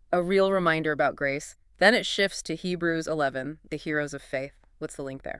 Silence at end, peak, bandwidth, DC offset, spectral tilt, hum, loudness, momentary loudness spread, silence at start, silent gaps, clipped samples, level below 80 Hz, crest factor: 0 s; -4 dBFS; 12 kHz; under 0.1%; -4.5 dB/octave; none; -26 LUFS; 15 LU; 0.1 s; none; under 0.1%; -56 dBFS; 22 dB